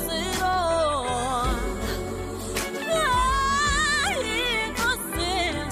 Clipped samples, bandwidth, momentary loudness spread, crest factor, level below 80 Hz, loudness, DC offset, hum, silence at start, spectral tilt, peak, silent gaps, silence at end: under 0.1%; 15.5 kHz; 8 LU; 14 dB; -36 dBFS; -24 LUFS; under 0.1%; none; 0 s; -3 dB/octave; -12 dBFS; none; 0 s